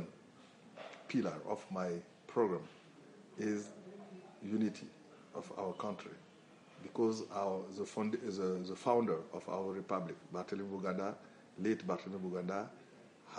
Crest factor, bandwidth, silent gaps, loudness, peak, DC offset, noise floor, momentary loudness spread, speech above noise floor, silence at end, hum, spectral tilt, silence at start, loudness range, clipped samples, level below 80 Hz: 22 dB; 10.5 kHz; none; -40 LUFS; -18 dBFS; under 0.1%; -61 dBFS; 21 LU; 22 dB; 0 s; none; -6.5 dB/octave; 0 s; 5 LU; under 0.1%; -86 dBFS